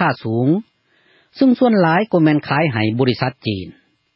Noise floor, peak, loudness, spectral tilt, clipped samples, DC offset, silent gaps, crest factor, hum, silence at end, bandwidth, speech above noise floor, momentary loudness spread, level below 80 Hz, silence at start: -57 dBFS; -2 dBFS; -17 LUFS; -11 dB/octave; under 0.1%; under 0.1%; none; 16 dB; none; 0.45 s; 5.8 kHz; 41 dB; 11 LU; -52 dBFS; 0 s